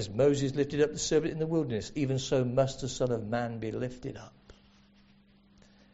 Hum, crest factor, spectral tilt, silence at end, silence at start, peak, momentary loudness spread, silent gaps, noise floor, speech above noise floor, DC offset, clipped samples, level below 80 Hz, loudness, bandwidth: none; 18 dB; -6 dB/octave; 1.4 s; 0 s; -14 dBFS; 10 LU; none; -61 dBFS; 31 dB; under 0.1%; under 0.1%; -54 dBFS; -30 LUFS; 8 kHz